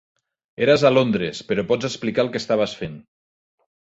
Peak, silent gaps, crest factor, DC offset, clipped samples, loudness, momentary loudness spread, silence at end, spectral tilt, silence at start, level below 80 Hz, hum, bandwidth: -4 dBFS; none; 18 dB; under 0.1%; under 0.1%; -20 LUFS; 10 LU; 0.95 s; -5.5 dB/octave; 0.6 s; -56 dBFS; none; 8 kHz